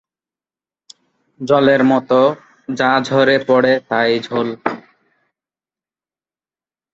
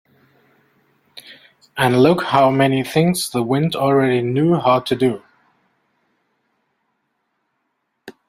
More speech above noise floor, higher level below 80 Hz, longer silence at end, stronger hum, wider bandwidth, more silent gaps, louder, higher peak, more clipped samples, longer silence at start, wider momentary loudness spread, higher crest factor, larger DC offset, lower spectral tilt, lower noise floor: first, over 76 dB vs 56 dB; about the same, -62 dBFS vs -58 dBFS; first, 2.15 s vs 0.2 s; neither; second, 8 kHz vs 16 kHz; neither; about the same, -15 LUFS vs -16 LUFS; about the same, -2 dBFS vs -2 dBFS; neither; first, 1.4 s vs 1.15 s; first, 13 LU vs 8 LU; about the same, 16 dB vs 18 dB; neither; about the same, -6 dB/octave vs -6 dB/octave; first, under -90 dBFS vs -72 dBFS